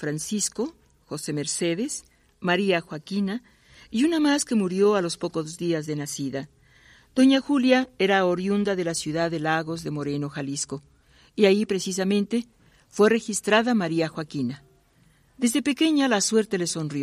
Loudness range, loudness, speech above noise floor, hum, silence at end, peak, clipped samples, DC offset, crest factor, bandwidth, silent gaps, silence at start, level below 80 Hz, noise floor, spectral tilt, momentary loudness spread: 4 LU; -24 LUFS; 36 dB; none; 0 s; -6 dBFS; under 0.1%; under 0.1%; 18 dB; 15 kHz; none; 0 s; -62 dBFS; -60 dBFS; -4.5 dB/octave; 11 LU